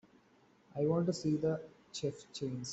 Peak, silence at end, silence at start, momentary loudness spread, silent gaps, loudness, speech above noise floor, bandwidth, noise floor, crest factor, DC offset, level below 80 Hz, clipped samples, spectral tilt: -20 dBFS; 0 s; 0.75 s; 10 LU; none; -37 LUFS; 32 dB; 8.2 kHz; -67 dBFS; 18 dB; under 0.1%; -70 dBFS; under 0.1%; -6.5 dB/octave